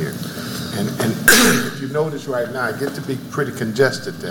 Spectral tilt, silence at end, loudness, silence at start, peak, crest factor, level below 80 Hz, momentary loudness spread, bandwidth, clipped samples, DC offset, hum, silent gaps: -3.5 dB/octave; 0 s; -18 LUFS; 0 s; 0 dBFS; 20 dB; -48 dBFS; 15 LU; 17.5 kHz; under 0.1%; under 0.1%; none; none